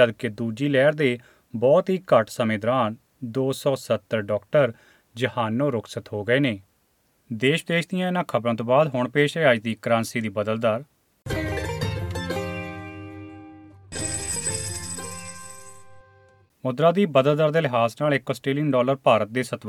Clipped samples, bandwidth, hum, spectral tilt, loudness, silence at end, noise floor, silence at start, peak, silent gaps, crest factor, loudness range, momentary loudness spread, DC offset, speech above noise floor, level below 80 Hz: under 0.1%; 17.5 kHz; none; -5 dB/octave; -23 LUFS; 0 s; -66 dBFS; 0 s; -4 dBFS; none; 20 dB; 8 LU; 16 LU; under 0.1%; 44 dB; -50 dBFS